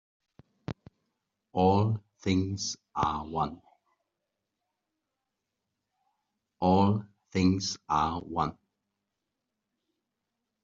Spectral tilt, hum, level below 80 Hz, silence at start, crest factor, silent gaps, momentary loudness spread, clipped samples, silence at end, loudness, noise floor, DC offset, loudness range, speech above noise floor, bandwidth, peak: -6 dB/octave; none; -60 dBFS; 0.7 s; 22 dB; none; 12 LU; under 0.1%; 2.1 s; -29 LUFS; -85 dBFS; under 0.1%; 8 LU; 58 dB; 7.4 kHz; -10 dBFS